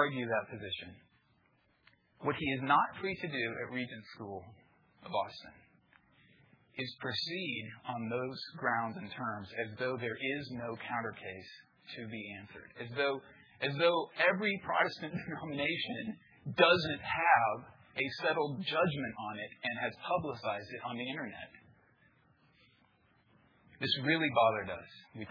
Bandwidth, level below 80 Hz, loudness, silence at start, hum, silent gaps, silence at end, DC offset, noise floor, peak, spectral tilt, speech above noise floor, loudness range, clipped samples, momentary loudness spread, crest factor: 5.4 kHz; -72 dBFS; -34 LUFS; 0 s; none; none; 0 s; under 0.1%; -72 dBFS; -12 dBFS; -6.5 dB/octave; 37 dB; 10 LU; under 0.1%; 17 LU; 24 dB